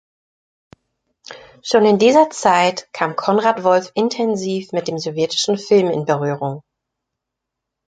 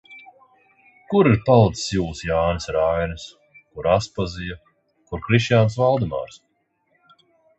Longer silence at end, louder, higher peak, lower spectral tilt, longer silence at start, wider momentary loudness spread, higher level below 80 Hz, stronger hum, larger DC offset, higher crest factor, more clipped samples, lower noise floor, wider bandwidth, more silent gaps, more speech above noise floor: about the same, 1.3 s vs 1.2 s; first, -17 LUFS vs -20 LUFS; about the same, -2 dBFS vs -2 dBFS; second, -4.5 dB/octave vs -6.5 dB/octave; first, 1.3 s vs 0.1 s; second, 12 LU vs 18 LU; second, -64 dBFS vs -42 dBFS; neither; neither; about the same, 16 dB vs 20 dB; neither; first, -81 dBFS vs -67 dBFS; first, 9.4 kHz vs 8.2 kHz; neither; first, 65 dB vs 48 dB